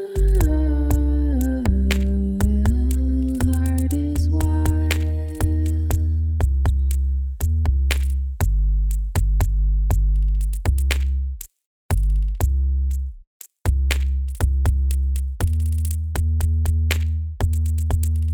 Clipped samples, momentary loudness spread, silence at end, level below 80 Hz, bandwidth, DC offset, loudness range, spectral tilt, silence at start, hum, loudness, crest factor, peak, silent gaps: under 0.1%; 4 LU; 0 s; -20 dBFS; 19.5 kHz; under 0.1%; 3 LU; -6.5 dB/octave; 0 s; none; -22 LUFS; 16 dB; -2 dBFS; 11.66-11.89 s, 13.27-13.40 s